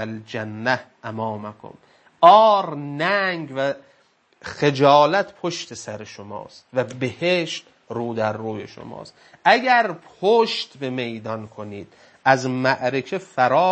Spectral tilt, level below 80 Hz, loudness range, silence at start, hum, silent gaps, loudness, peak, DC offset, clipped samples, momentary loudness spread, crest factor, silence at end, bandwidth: -5 dB/octave; -68 dBFS; 7 LU; 0 s; none; none; -20 LUFS; 0 dBFS; under 0.1%; under 0.1%; 20 LU; 22 dB; 0 s; 8.6 kHz